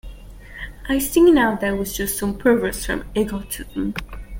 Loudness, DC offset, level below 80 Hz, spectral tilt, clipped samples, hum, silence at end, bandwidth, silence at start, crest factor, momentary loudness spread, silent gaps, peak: -20 LUFS; under 0.1%; -36 dBFS; -4.5 dB/octave; under 0.1%; none; 0 s; 17 kHz; 0.05 s; 16 dB; 18 LU; none; -4 dBFS